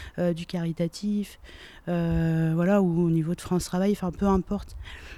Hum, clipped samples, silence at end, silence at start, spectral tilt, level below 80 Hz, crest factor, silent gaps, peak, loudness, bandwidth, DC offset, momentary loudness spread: none; under 0.1%; 0 s; 0 s; -7.5 dB/octave; -42 dBFS; 16 dB; none; -10 dBFS; -26 LUFS; 14 kHz; under 0.1%; 16 LU